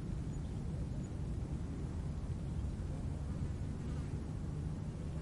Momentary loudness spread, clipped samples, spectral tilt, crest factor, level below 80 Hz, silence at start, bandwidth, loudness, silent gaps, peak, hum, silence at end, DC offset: 1 LU; under 0.1%; -8 dB/octave; 12 dB; -46 dBFS; 0 s; 11.5 kHz; -42 LUFS; none; -28 dBFS; none; 0 s; under 0.1%